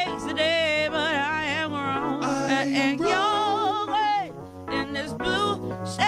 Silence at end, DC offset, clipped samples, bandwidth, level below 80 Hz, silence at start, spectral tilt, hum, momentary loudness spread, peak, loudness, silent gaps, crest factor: 0 s; under 0.1%; under 0.1%; 14.5 kHz; -56 dBFS; 0 s; -4 dB/octave; none; 8 LU; -8 dBFS; -25 LUFS; none; 16 dB